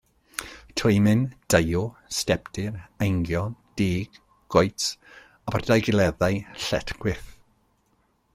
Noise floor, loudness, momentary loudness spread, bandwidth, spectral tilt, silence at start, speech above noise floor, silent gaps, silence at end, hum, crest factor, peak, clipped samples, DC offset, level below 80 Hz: -67 dBFS; -25 LUFS; 15 LU; 16 kHz; -5 dB/octave; 0.4 s; 43 dB; none; 1.05 s; none; 22 dB; -4 dBFS; under 0.1%; under 0.1%; -46 dBFS